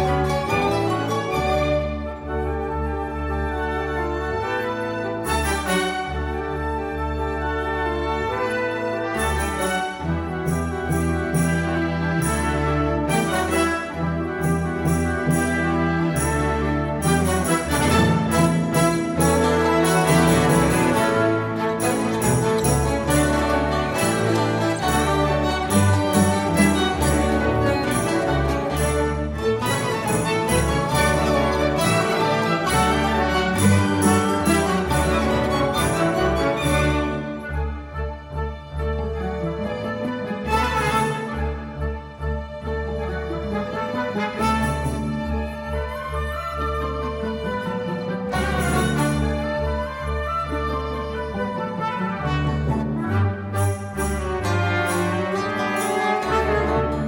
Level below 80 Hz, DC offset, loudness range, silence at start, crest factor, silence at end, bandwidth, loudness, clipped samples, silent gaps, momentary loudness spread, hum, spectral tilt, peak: -32 dBFS; under 0.1%; 6 LU; 0 s; 18 dB; 0 s; 17 kHz; -22 LUFS; under 0.1%; none; 8 LU; none; -5.5 dB/octave; -4 dBFS